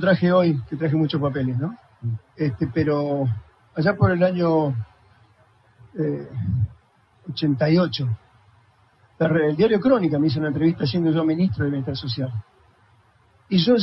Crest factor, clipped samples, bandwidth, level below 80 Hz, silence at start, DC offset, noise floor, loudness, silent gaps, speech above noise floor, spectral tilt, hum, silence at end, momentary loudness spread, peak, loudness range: 16 dB; under 0.1%; 5.8 kHz; -52 dBFS; 0 s; under 0.1%; -58 dBFS; -22 LUFS; none; 37 dB; -10 dB/octave; none; 0 s; 12 LU; -6 dBFS; 4 LU